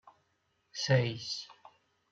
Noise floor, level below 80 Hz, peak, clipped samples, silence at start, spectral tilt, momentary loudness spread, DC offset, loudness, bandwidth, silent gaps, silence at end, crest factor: -77 dBFS; -74 dBFS; -12 dBFS; under 0.1%; 0.05 s; -5 dB/octave; 17 LU; under 0.1%; -32 LUFS; 7.8 kHz; none; 0.6 s; 24 dB